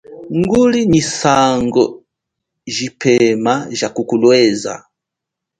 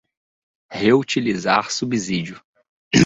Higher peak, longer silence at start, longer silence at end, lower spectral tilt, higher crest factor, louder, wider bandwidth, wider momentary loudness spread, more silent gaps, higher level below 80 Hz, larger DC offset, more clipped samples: about the same, 0 dBFS vs -2 dBFS; second, 0.1 s vs 0.7 s; first, 0.8 s vs 0 s; about the same, -5 dB/octave vs -4.5 dB/octave; second, 14 dB vs 20 dB; first, -14 LUFS vs -20 LUFS; first, 9.6 kHz vs 8.2 kHz; about the same, 11 LU vs 9 LU; second, none vs 2.44-2.54 s, 2.69-2.91 s; first, -46 dBFS vs -52 dBFS; neither; neither